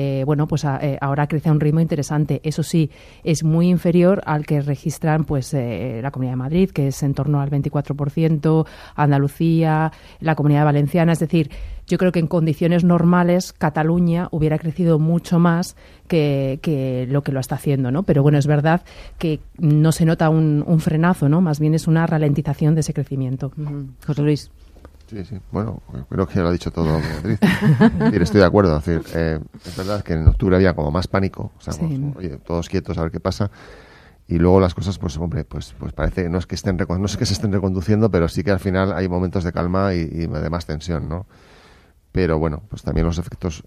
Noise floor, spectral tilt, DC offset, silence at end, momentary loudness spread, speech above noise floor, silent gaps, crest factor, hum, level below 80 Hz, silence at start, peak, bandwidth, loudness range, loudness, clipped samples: -50 dBFS; -7.5 dB/octave; under 0.1%; 0.05 s; 10 LU; 32 dB; none; 18 dB; none; -34 dBFS; 0 s; 0 dBFS; 14 kHz; 6 LU; -19 LUFS; under 0.1%